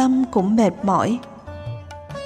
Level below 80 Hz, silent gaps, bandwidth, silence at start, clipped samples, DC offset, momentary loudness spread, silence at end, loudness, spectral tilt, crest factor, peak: -50 dBFS; none; 9.6 kHz; 0 s; under 0.1%; under 0.1%; 17 LU; 0 s; -19 LUFS; -7 dB/octave; 14 dB; -6 dBFS